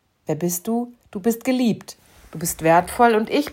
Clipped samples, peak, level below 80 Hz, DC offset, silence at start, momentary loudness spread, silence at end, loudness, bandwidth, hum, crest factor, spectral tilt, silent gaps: under 0.1%; -2 dBFS; -52 dBFS; under 0.1%; 0.3 s; 13 LU; 0 s; -21 LUFS; 16.5 kHz; none; 18 dB; -5 dB/octave; none